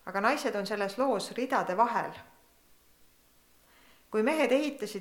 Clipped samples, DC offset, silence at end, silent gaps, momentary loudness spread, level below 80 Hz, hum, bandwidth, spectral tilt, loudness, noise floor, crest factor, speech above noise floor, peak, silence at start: under 0.1%; under 0.1%; 0 s; none; 8 LU; -72 dBFS; none; 19 kHz; -4.5 dB/octave; -30 LUFS; -63 dBFS; 20 dB; 34 dB; -12 dBFS; 0.05 s